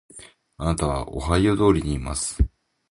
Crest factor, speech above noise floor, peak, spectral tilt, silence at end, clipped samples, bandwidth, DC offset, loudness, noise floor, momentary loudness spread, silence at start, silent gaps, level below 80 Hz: 20 dB; 25 dB; -4 dBFS; -5.5 dB/octave; 0.45 s; under 0.1%; 11.5 kHz; under 0.1%; -23 LUFS; -47 dBFS; 8 LU; 0.15 s; none; -32 dBFS